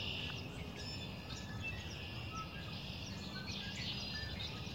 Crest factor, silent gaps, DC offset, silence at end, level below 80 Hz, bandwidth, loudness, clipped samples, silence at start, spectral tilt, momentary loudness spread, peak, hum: 14 dB; none; under 0.1%; 0 s; -56 dBFS; 16 kHz; -44 LUFS; under 0.1%; 0 s; -4 dB/octave; 5 LU; -30 dBFS; none